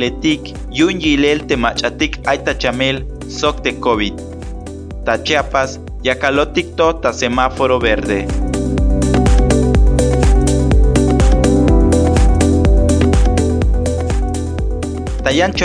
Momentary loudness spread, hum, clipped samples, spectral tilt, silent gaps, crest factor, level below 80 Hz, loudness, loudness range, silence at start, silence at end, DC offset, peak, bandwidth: 9 LU; none; under 0.1%; -5.5 dB/octave; none; 14 dB; -18 dBFS; -15 LUFS; 5 LU; 0 s; 0 s; under 0.1%; 0 dBFS; 10.5 kHz